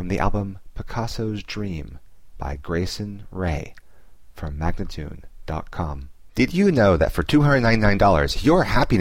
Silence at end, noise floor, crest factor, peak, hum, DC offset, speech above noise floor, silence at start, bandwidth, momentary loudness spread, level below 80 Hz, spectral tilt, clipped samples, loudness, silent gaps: 0 s; -50 dBFS; 16 dB; -4 dBFS; none; 0.8%; 29 dB; 0 s; 16 kHz; 18 LU; -32 dBFS; -6.5 dB/octave; under 0.1%; -22 LUFS; none